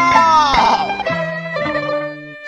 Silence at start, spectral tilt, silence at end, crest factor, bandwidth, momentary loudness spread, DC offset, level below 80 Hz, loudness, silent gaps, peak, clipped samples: 0 s; -4 dB/octave; 0 s; 16 dB; 10.5 kHz; 11 LU; under 0.1%; -40 dBFS; -15 LUFS; none; 0 dBFS; under 0.1%